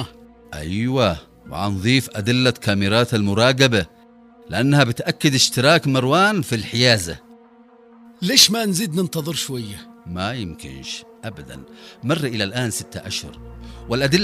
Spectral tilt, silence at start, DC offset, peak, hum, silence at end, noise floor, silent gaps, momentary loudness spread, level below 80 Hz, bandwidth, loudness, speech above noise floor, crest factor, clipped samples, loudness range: -4 dB/octave; 0 s; under 0.1%; 0 dBFS; none; 0 s; -49 dBFS; none; 19 LU; -48 dBFS; 16 kHz; -18 LUFS; 29 dB; 20 dB; under 0.1%; 9 LU